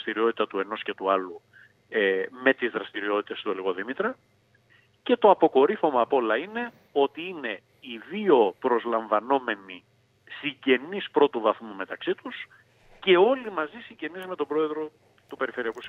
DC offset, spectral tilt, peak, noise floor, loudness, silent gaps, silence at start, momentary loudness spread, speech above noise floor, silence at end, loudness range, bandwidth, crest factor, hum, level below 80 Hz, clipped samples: under 0.1%; -6.5 dB/octave; -4 dBFS; -62 dBFS; -26 LUFS; none; 0 s; 16 LU; 36 dB; 0 s; 4 LU; 4.7 kHz; 22 dB; none; -76 dBFS; under 0.1%